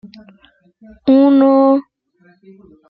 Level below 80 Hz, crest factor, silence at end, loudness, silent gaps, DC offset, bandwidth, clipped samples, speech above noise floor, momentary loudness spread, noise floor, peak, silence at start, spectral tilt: -60 dBFS; 14 dB; 1.1 s; -12 LUFS; none; under 0.1%; 4.9 kHz; under 0.1%; 40 dB; 9 LU; -54 dBFS; -2 dBFS; 1.05 s; -10 dB/octave